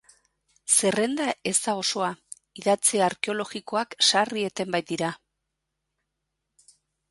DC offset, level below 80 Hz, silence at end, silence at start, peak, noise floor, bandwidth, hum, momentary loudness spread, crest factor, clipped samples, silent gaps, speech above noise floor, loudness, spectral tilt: under 0.1%; -72 dBFS; 1.95 s; 0.65 s; -6 dBFS; -81 dBFS; 12 kHz; none; 11 LU; 20 dB; under 0.1%; none; 56 dB; -24 LUFS; -2 dB/octave